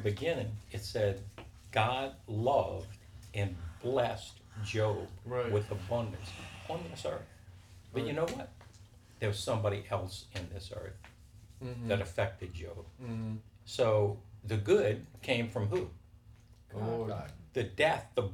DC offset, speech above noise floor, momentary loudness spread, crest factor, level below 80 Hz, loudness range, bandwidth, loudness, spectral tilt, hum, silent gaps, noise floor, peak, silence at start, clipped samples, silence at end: under 0.1%; 23 dB; 15 LU; 22 dB; -58 dBFS; 6 LU; 14.5 kHz; -35 LUFS; -6 dB/octave; none; none; -58 dBFS; -14 dBFS; 0 s; under 0.1%; 0 s